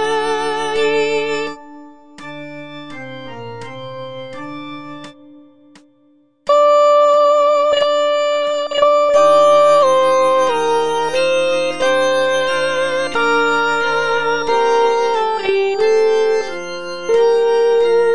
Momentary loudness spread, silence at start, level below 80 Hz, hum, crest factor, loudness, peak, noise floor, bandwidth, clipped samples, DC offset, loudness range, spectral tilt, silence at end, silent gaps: 19 LU; 0 s; -56 dBFS; none; 14 dB; -14 LUFS; 0 dBFS; -54 dBFS; 10 kHz; under 0.1%; 2%; 18 LU; -3 dB/octave; 0 s; none